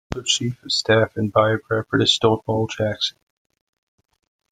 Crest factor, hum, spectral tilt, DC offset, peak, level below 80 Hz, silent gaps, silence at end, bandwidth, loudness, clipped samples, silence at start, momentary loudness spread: 20 dB; none; -4 dB/octave; under 0.1%; -2 dBFS; -50 dBFS; none; 1.4 s; 9.6 kHz; -20 LUFS; under 0.1%; 0.1 s; 7 LU